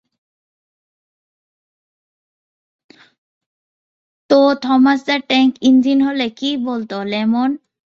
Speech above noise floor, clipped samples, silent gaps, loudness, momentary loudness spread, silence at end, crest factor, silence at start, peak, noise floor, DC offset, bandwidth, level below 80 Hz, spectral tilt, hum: over 75 dB; under 0.1%; none; -15 LUFS; 9 LU; 0.35 s; 16 dB; 4.3 s; -2 dBFS; under -90 dBFS; under 0.1%; 7.2 kHz; -64 dBFS; -5 dB/octave; none